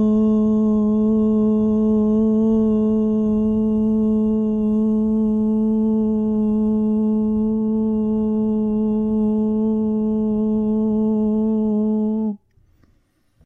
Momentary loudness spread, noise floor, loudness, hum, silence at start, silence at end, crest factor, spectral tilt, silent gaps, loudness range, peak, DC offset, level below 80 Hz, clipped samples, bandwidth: 3 LU; -61 dBFS; -19 LUFS; none; 0 s; 1.1 s; 10 dB; -12 dB/octave; none; 2 LU; -10 dBFS; under 0.1%; -42 dBFS; under 0.1%; 3 kHz